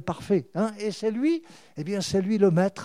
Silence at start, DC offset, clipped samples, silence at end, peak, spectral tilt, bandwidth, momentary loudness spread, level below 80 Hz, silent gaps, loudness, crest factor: 0 s; 0.1%; under 0.1%; 0 s; -8 dBFS; -6.5 dB/octave; 13 kHz; 10 LU; -60 dBFS; none; -26 LUFS; 16 dB